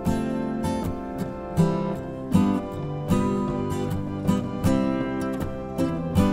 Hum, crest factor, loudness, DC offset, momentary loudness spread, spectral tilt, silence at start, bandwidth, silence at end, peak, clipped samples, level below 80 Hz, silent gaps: none; 18 dB; -26 LUFS; under 0.1%; 8 LU; -7.5 dB/octave; 0 s; 16 kHz; 0 s; -6 dBFS; under 0.1%; -40 dBFS; none